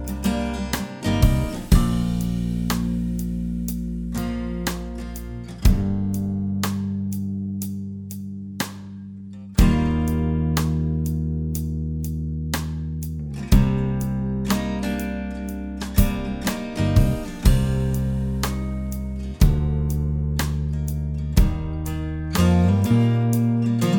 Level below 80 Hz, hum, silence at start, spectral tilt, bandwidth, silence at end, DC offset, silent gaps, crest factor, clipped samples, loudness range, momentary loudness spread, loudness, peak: -26 dBFS; none; 0 s; -6.5 dB/octave; over 20 kHz; 0 s; under 0.1%; none; 20 dB; under 0.1%; 4 LU; 11 LU; -24 LUFS; -2 dBFS